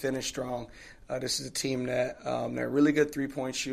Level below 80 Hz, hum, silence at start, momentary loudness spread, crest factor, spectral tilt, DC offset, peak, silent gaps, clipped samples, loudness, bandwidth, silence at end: -58 dBFS; none; 0 s; 13 LU; 18 dB; -4 dB/octave; under 0.1%; -12 dBFS; none; under 0.1%; -30 LUFS; 14.5 kHz; 0 s